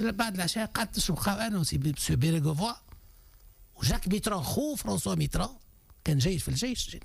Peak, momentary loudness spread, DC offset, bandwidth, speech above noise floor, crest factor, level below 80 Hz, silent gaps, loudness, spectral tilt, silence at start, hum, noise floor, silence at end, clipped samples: -18 dBFS; 5 LU; under 0.1%; 15.5 kHz; 26 dB; 12 dB; -42 dBFS; none; -30 LUFS; -4.5 dB/octave; 0 s; none; -55 dBFS; 0 s; under 0.1%